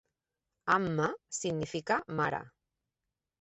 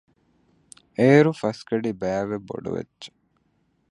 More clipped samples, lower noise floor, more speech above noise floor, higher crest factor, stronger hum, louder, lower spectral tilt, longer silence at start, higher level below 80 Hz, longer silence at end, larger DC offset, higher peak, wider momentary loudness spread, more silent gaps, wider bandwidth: neither; first, -89 dBFS vs -68 dBFS; first, 56 dB vs 46 dB; about the same, 20 dB vs 22 dB; neither; second, -33 LUFS vs -23 LUFS; second, -4.5 dB/octave vs -7.5 dB/octave; second, 0.65 s vs 1 s; second, -68 dBFS vs -60 dBFS; about the same, 0.95 s vs 0.85 s; neither; second, -14 dBFS vs -4 dBFS; second, 8 LU vs 22 LU; neither; second, 8 kHz vs 11 kHz